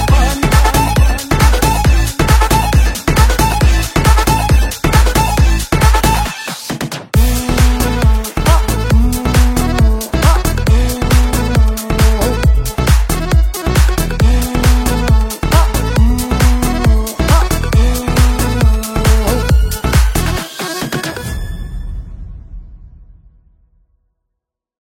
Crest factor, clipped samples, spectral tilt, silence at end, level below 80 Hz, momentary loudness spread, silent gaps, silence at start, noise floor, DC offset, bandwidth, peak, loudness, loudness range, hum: 12 dB; under 0.1%; -5 dB/octave; 1.95 s; -14 dBFS; 8 LU; none; 0 s; -77 dBFS; under 0.1%; 17 kHz; 0 dBFS; -13 LUFS; 6 LU; none